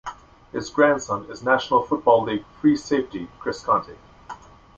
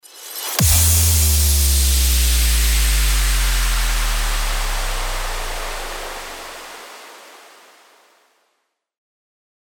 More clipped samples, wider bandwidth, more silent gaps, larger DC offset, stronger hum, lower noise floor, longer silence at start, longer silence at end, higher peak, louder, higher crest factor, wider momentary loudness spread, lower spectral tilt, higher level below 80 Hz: neither; second, 7.8 kHz vs over 20 kHz; neither; neither; neither; second, -42 dBFS vs -71 dBFS; about the same, 0.05 s vs 0.15 s; second, 0.45 s vs 2.3 s; about the same, -4 dBFS vs -2 dBFS; second, -22 LUFS vs -17 LUFS; about the same, 20 dB vs 16 dB; first, 22 LU vs 19 LU; first, -5 dB/octave vs -2 dB/octave; second, -54 dBFS vs -20 dBFS